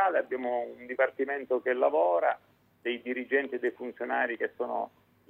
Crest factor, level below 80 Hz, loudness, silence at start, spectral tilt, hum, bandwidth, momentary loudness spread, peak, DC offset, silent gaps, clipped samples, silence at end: 18 dB; -82 dBFS; -30 LUFS; 0 s; -6 dB/octave; none; 4.2 kHz; 10 LU; -12 dBFS; under 0.1%; none; under 0.1%; 0.4 s